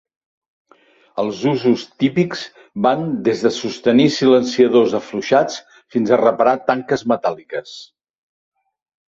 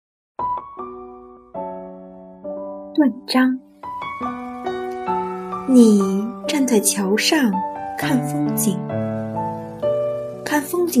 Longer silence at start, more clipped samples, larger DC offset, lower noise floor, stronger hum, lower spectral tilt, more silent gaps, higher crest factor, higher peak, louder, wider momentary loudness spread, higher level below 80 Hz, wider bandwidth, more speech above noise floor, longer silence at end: first, 1.15 s vs 0.4 s; neither; neither; first, -53 dBFS vs -41 dBFS; neither; first, -6 dB/octave vs -4.5 dB/octave; neither; about the same, 16 dB vs 20 dB; about the same, -2 dBFS vs 0 dBFS; first, -17 LUFS vs -20 LUFS; about the same, 15 LU vs 17 LU; about the same, -60 dBFS vs -58 dBFS; second, 7.6 kHz vs 15.5 kHz; first, 37 dB vs 23 dB; first, 1.25 s vs 0 s